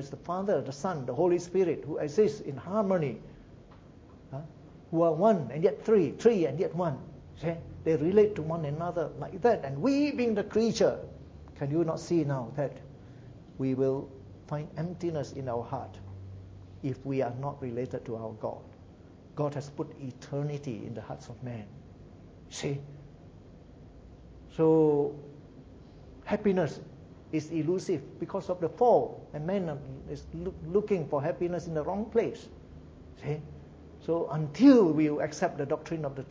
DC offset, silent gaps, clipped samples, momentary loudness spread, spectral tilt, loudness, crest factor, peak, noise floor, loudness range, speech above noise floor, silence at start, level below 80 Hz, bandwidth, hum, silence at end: under 0.1%; none; under 0.1%; 21 LU; -7.5 dB/octave; -30 LUFS; 22 dB; -10 dBFS; -52 dBFS; 10 LU; 23 dB; 0 s; -56 dBFS; 8 kHz; none; 0 s